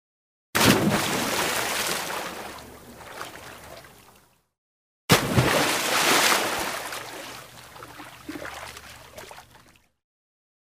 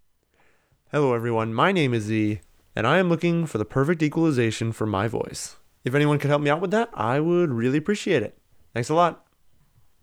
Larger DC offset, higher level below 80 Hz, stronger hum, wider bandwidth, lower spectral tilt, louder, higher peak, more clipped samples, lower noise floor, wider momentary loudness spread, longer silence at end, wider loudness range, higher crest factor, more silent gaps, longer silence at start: neither; about the same, -52 dBFS vs -56 dBFS; neither; about the same, 16 kHz vs 15.5 kHz; second, -3 dB/octave vs -6.5 dB/octave; about the same, -22 LUFS vs -23 LUFS; about the same, -4 dBFS vs -6 dBFS; neither; second, -58 dBFS vs -62 dBFS; first, 24 LU vs 10 LU; first, 1.4 s vs 0.9 s; first, 17 LU vs 1 LU; about the same, 22 dB vs 18 dB; first, 4.58-5.08 s vs none; second, 0.55 s vs 0.95 s